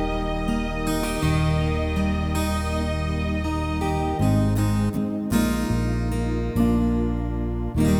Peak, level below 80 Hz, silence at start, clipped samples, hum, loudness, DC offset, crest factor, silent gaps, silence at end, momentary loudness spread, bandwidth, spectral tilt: -8 dBFS; -30 dBFS; 0 s; under 0.1%; none; -24 LUFS; under 0.1%; 14 dB; none; 0 s; 5 LU; 19.5 kHz; -6.5 dB/octave